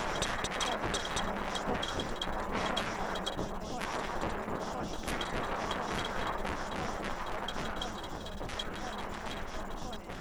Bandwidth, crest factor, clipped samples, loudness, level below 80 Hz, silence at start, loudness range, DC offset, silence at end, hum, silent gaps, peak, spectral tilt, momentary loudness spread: over 20 kHz; 22 dB; under 0.1%; -36 LUFS; -44 dBFS; 0 s; 4 LU; under 0.1%; 0 s; none; none; -14 dBFS; -3.5 dB/octave; 7 LU